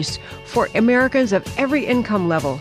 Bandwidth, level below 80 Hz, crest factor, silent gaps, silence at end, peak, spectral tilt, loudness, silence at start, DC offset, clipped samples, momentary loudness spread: 14.5 kHz; -46 dBFS; 12 dB; none; 0 s; -6 dBFS; -5.5 dB/octave; -18 LUFS; 0 s; under 0.1%; under 0.1%; 8 LU